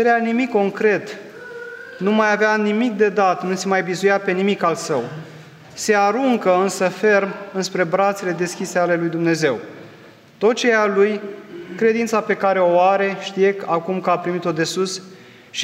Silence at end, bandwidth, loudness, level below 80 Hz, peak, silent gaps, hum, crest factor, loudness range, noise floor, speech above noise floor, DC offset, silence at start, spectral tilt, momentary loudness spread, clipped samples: 0 s; 15.5 kHz; -19 LUFS; -72 dBFS; -2 dBFS; none; none; 16 dB; 2 LU; -45 dBFS; 26 dB; under 0.1%; 0 s; -4.5 dB/octave; 15 LU; under 0.1%